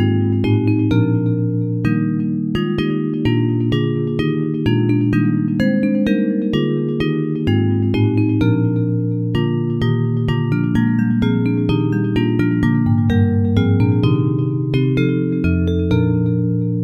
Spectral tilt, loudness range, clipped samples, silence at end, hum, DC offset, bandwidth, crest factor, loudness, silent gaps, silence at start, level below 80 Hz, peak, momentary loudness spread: -9.5 dB/octave; 2 LU; under 0.1%; 0 s; none; under 0.1%; 6.4 kHz; 14 dB; -17 LUFS; none; 0 s; -38 dBFS; -2 dBFS; 3 LU